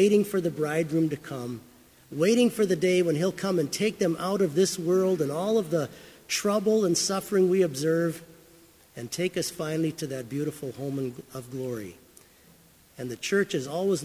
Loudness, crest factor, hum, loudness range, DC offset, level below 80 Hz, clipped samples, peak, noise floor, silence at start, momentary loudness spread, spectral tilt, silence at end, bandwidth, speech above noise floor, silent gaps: -27 LUFS; 16 dB; none; 8 LU; under 0.1%; -66 dBFS; under 0.1%; -10 dBFS; -57 dBFS; 0 s; 14 LU; -5 dB/octave; 0 s; 16 kHz; 31 dB; none